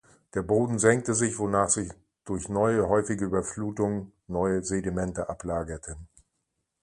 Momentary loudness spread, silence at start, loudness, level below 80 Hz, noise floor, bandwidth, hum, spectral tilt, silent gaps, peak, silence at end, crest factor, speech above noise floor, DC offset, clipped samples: 13 LU; 0.35 s; -27 LUFS; -50 dBFS; -80 dBFS; 11.5 kHz; none; -5.5 dB/octave; none; -6 dBFS; 0.75 s; 22 dB; 53 dB; under 0.1%; under 0.1%